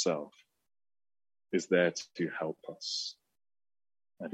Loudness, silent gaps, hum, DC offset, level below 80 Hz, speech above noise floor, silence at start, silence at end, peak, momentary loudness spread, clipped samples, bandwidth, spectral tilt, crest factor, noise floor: -34 LUFS; none; none; under 0.1%; -84 dBFS; over 57 dB; 0 s; 0 s; -14 dBFS; 13 LU; under 0.1%; 8.8 kHz; -4 dB/octave; 24 dB; under -90 dBFS